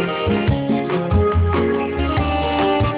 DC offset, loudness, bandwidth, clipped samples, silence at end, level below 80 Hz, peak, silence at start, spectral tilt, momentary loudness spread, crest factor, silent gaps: under 0.1%; -19 LUFS; 4 kHz; under 0.1%; 0 s; -26 dBFS; -6 dBFS; 0 s; -11 dB/octave; 3 LU; 12 dB; none